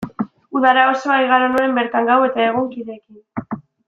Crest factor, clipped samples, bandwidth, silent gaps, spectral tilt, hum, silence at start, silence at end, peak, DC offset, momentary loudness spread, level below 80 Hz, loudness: 16 dB; under 0.1%; 9 kHz; none; -5.5 dB/octave; none; 0 s; 0.3 s; -2 dBFS; under 0.1%; 18 LU; -60 dBFS; -16 LUFS